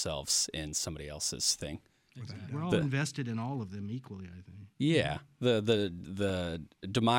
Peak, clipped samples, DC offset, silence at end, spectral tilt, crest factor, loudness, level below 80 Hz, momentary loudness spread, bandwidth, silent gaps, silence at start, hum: -12 dBFS; under 0.1%; under 0.1%; 0 s; -4 dB/octave; 20 dB; -33 LUFS; -56 dBFS; 17 LU; 17 kHz; none; 0 s; none